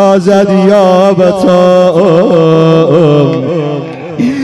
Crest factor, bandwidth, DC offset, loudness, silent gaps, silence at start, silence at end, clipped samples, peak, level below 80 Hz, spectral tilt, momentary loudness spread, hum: 6 dB; 12 kHz; under 0.1%; -7 LUFS; none; 0 s; 0 s; 5%; 0 dBFS; -46 dBFS; -7.5 dB/octave; 8 LU; none